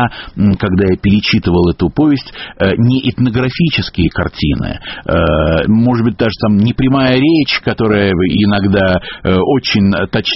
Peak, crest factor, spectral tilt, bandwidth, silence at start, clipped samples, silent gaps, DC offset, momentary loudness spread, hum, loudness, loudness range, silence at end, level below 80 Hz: 0 dBFS; 12 dB; -5.5 dB/octave; 6 kHz; 0 s; under 0.1%; none; under 0.1%; 5 LU; none; -13 LUFS; 2 LU; 0 s; -30 dBFS